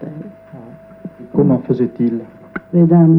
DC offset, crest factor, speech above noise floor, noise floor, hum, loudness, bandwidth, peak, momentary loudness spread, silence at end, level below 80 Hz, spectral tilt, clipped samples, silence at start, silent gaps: under 0.1%; 14 dB; 25 dB; -37 dBFS; none; -15 LUFS; 2.8 kHz; -2 dBFS; 23 LU; 0 s; -50 dBFS; -12.5 dB/octave; under 0.1%; 0 s; none